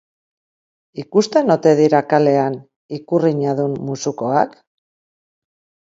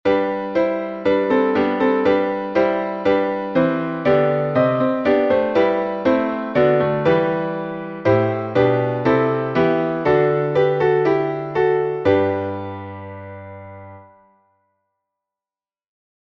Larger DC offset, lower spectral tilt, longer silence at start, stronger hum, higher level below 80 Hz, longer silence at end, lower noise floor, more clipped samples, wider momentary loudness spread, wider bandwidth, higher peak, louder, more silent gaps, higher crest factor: neither; second, -6.5 dB/octave vs -8.5 dB/octave; first, 0.95 s vs 0.05 s; neither; second, -66 dBFS vs -54 dBFS; second, 1.45 s vs 2.2 s; about the same, under -90 dBFS vs under -90 dBFS; neither; first, 18 LU vs 10 LU; first, 7.8 kHz vs 6.6 kHz; first, 0 dBFS vs -4 dBFS; about the same, -17 LUFS vs -18 LUFS; first, 2.76-2.89 s vs none; about the same, 18 dB vs 16 dB